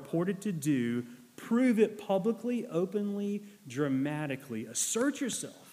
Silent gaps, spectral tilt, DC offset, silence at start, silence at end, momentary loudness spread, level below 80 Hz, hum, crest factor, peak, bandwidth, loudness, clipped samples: none; -5 dB/octave; under 0.1%; 0 s; 0 s; 9 LU; -80 dBFS; none; 18 dB; -14 dBFS; 15.5 kHz; -32 LUFS; under 0.1%